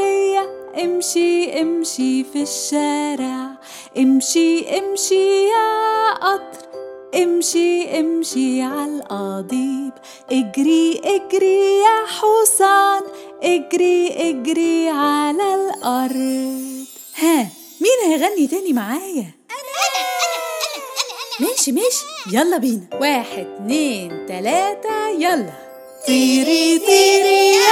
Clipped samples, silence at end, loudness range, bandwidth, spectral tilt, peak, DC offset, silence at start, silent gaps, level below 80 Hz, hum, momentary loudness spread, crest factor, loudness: under 0.1%; 0 s; 5 LU; 17.5 kHz; -2.5 dB/octave; 0 dBFS; under 0.1%; 0 s; none; -70 dBFS; none; 13 LU; 18 dB; -17 LUFS